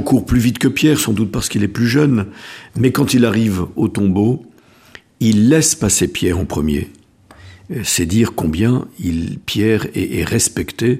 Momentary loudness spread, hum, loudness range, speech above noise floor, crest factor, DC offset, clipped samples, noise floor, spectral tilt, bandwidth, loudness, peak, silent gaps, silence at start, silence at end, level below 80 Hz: 8 LU; none; 3 LU; 28 dB; 16 dB; under 0.1%; under 0.1%; -43 dBFS; -5 dB/octave; 15.5 kHz; -16 LUFS; 0 dBFS; none; 0 s; 0 s; -36 dBFS